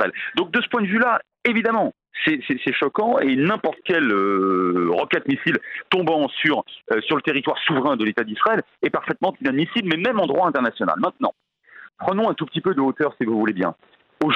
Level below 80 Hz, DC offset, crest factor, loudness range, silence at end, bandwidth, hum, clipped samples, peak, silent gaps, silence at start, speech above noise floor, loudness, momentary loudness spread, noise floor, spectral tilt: -66 dBFS; under 0.1%; 18 dB; 2 LU; 0 s; 6.8 kHz; none; under 0.1%; -2 dBFS; none; 0 s; 26 dB; -21 LUFS; 5 LU; -47 dBFS; -7.5 dB/octave